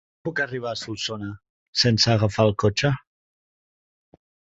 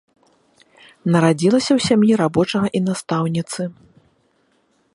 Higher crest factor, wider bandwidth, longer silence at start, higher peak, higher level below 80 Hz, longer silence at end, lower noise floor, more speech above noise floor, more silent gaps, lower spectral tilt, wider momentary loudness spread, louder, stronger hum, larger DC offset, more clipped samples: about the same, 20 dB vs 18 dB; second, 8 kHz vs 11.5 kHz; second, 0.25 s vs 1.05 s; about the same, -4 dBFS vs -2 dBFS; first, -50 dBFS vs -56 dBFS; first, 1.6 s vs 1.25 s; first, under -90 dBFS vs -62 dBFS; first, over 68 dB vs 45 dB; first, 1.49-1.73 s vs none; second, -4.5 dB/octave vs -6 dB/octave; about the same, 12 LU vs 12 LU; second, -23 LUFS vs -18 LUFS; neither; neither; neither